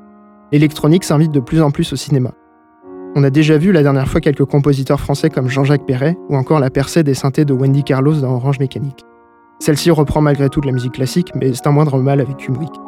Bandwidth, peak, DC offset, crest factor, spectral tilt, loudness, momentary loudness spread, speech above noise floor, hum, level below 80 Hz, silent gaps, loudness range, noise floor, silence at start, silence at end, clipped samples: 14.5 kHz; 0 dBFS; under 0.1%; 14 dB; -7 dB/octave; -14 LUFS; 7 LU; 33 dB; none; -38 dBFS; none; 2 LU; -46 dBFS; 0.5 s; 0 s; under 0.1%